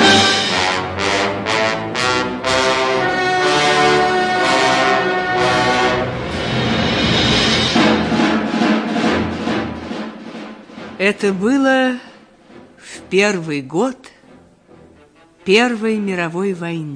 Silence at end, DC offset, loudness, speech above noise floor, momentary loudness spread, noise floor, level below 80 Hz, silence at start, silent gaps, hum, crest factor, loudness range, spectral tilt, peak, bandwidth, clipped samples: 0 s; under 0.1%; -16 LUFS; 31 dB; 12 LU; -48 dBFS; -42 dBFS; 0 s; none; none; 16 dB; 6 LU; -4 dB/octave; 0 dBFS; 10.5 kHz; under 0.1%